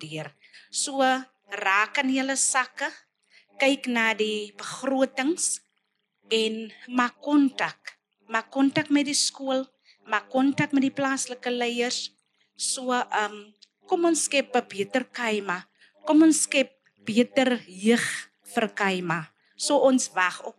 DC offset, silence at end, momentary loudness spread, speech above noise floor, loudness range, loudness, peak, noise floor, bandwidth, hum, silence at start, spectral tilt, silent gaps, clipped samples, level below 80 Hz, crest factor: under 0.1%; 0.1 s; 10 LU; 51 dB; 3 LU; -25 LUFS; -8 dBFS; -76 dBFS; 13 kHz; none; 0 s; -2.5 dB/octave; none; under 0.1%; under -90 dBFS; 18 dB